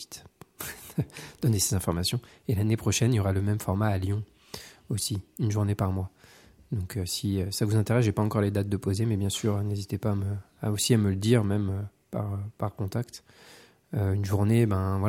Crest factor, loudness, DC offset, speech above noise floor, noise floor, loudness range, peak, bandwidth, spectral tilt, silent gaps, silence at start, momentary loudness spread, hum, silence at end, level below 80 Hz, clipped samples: 20 dB; -28 LUFS; under 0.1%; 28 dB; -55 dBFS; 4 LU; -8 dBFS; 16.5 kHz; -5.5 dB/octave; none; 0 s; 12 LU; none; 0 s; -58 dBFS; under 0.1%